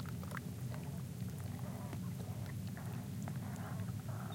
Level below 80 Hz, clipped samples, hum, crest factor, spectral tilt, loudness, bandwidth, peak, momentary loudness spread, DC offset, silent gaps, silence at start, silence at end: -62 dBFS; under 0.1%; none; 16 dB; -6.5 dB/octave; -44 LUFS; 17 kHz; -28 dBFS; 1 LU; under 0.1%; none; 0 s; 0 s